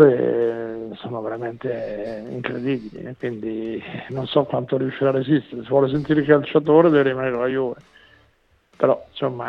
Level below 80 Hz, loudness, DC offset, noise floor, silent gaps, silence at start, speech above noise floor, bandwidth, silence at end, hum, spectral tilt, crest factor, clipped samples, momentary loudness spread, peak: -56 dBFS; -21 LUFS; under 0.1%; -60 dBFS; none; 0 s; 40 dB; 5.6 kHz; 0 s; none; -9 dB/octave; 20 dB; under 0.1%; 14 LU; 0 dBFS